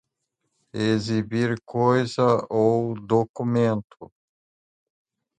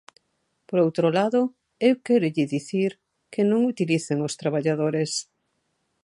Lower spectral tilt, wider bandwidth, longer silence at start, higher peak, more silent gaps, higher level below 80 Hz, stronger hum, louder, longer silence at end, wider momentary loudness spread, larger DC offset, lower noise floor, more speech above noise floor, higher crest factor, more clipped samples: about the same, -7 dB/octave vs -6 dB/octave; second, 9.4 kHz vs 11.5 kHz; about the same, 0.75 s vs 0.7 s; about the same, -6 dBFS vs -6 dBFS; first, 3.29-3.34 s, 3.84-3.88 s vs none; first, -60 dBFS vs -74 dBFS; neither; about the same, -23 LUFS vs -24 LUFS; first, 1.35 s vs 0.8 s; about the same, 5 LU vs 7 LU; neither; first, -78 dBFS vs -74 dBFS; first, 56 dB vs 51 dB; about the same, 18 dB vs 18 dB; neither